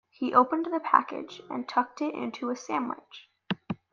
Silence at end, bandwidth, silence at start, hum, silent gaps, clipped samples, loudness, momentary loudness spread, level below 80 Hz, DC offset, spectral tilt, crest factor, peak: 0.15 s; 7.4 kHz; 0.2 s; none; none; under 0.1%; -28 LUFS; 14 LU; -76 dBFS; under 0.1%; -5.5 dB/octave; 26 dB; -4 dBFS